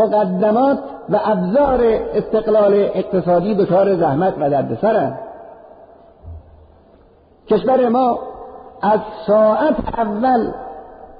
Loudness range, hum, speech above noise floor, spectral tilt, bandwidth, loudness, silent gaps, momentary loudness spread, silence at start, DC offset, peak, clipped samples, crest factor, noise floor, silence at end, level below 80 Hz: 6 LU; none; 34 dB; -6.5 dB/octave; 5 kHz; -16 LUFS; none; 11 LU; 0 s; under 0.1%; -4 dBFS; under 0.1%; 12 dB; -49 dBFS; 0.05 s; -44 dBFS